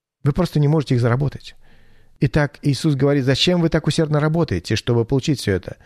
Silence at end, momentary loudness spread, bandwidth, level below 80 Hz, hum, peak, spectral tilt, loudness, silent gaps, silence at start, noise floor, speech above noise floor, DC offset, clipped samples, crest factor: 0.15 s; 6 LU; 13.5 kHz; -40 dBFS; none; -4 dBFS; -6.5 dB/octave; -19 LUFS; none; 0.25 s; -47 dBFS; 29 dB; under 0.1%; under 0.1%; 14 dB